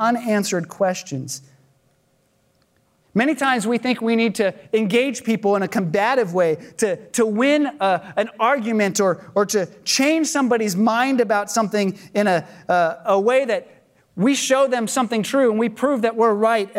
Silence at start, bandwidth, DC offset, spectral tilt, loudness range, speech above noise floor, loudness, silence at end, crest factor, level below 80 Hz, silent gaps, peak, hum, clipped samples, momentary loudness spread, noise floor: 0 s; 16 kHz; under 0.1%; -4 dB/octave; 4 LU; 43 dB; -20 LUFS; 0 s; 16 dB; -72 dBFS; none; -4 dBFS; none; under 0.1%; 6 LU; -63 dBFS